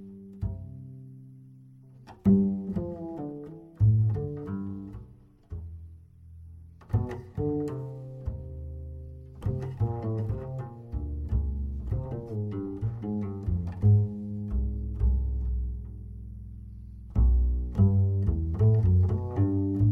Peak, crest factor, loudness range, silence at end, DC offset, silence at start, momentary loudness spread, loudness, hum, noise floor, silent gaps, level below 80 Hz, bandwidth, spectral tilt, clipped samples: -12 dBFS; 18 dB; 9 LU; 0 s; under 0.1%; 0 s; 21 LU; -29 LUFS; none; -53 dBFS; none; -34 dBFS; 2.8 kHz; -12 dB/octave; under 0.1%